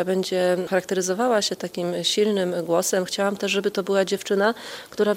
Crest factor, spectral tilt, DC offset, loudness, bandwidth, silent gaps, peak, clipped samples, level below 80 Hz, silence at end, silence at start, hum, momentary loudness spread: 16 dB; -3.5 dB/octave; under 0.1%; -23 LUFS; 16 kHz; none; -8 dBFS; under 0.1%; -68 dBFS; 0 s; 0 s; none; 4 LU